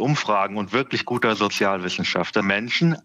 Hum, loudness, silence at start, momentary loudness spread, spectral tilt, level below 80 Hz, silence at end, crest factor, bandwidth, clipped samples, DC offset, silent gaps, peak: none; -22 LUFS; 0 s; 3 LU; -5 dB/octave; -70 dBFS; 0.05 s; 16 dB; 14.5 kHz; under 0.1%; under 0.1%; none; -6 dBFS